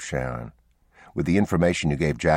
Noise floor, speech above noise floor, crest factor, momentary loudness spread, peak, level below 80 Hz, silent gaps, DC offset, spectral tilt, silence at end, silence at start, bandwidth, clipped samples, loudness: -55 dBFS; 32 dB; 18 dB; 14 LU; -6 dBFS; -42 dBFS; none; under 0.1%; -6 dB/octave; 0 s; 0 s; 12.5 kHz; under 0.1%; -24 LUFS